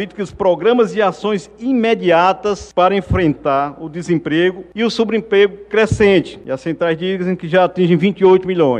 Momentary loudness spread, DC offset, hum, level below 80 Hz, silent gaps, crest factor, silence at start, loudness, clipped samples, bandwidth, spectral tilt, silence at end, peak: 8 LU; under 0.1%; none; -40 dBFS; none; 14 dB; 0 s; -15 LUFS; under 0.1%; 9.6 kHz; -6.5 dB/octave; 0 s; -2 dBFS